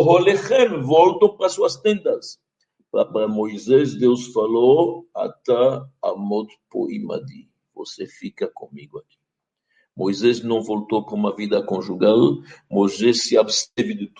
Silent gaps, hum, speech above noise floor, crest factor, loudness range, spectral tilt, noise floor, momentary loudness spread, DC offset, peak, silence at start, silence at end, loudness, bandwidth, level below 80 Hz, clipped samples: none; none; 62 dB; 18 dB; 10 LU; -5 dB/octave; -81 dBFS; 15 LU; under 0.1%; -2 dBFS; 0 s; 0.1 s; -20 LUFS; 9.4 kHz; -66 dBFS; under 0.1%